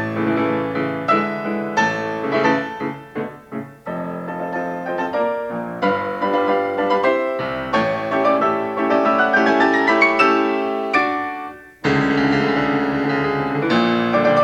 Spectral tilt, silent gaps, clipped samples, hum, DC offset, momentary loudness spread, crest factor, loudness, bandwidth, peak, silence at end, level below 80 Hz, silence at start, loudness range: -6 dB/octave; none; under 0.1%; none; under 0.1%; 12 LU; 18 dB; -19 LUFS; 9.4 kHz; 0 dBFS; 0 s; -52 dBFS; 0 s; 7 LU